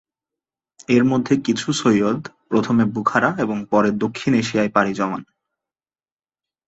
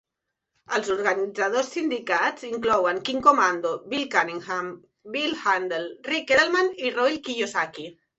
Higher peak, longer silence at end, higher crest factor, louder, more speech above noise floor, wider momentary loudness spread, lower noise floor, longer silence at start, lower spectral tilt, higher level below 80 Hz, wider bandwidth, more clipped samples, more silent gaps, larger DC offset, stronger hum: first, 0 dBFS vs -4 dBFS; first, 1.45 s vs 0.25 s; about the same, 20 dB vs 22 dB; first, -19 LUFS vs -24 LUFS; first, over 71 dB vs 59 dB; second, 7 LU vs 10 LU; first, under -90 dBFS vs -83 dBFS; first, 0.9 s vs 0.7 s; first, -5.5 dB/octave vs -3 dB/octave; first, -58 dBFS vs -64 dBFS; about the same, 8.2 kHz vs 8.2 kHz; neither; neither; neither; neither